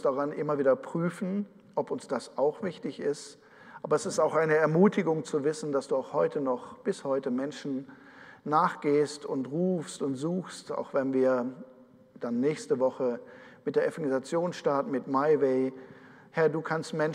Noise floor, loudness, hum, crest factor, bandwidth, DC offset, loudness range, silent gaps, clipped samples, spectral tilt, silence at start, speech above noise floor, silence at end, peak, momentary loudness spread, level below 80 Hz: -55 dBFS; -29 LUFS; none; 20 dB; 11 kHz; under 0.1%; 4 LU; none; under 0.1%; -6.5 dB/octave; 0 s; 26 dB; 0 s; -10 dBFS; 12 LU; -80 dBFS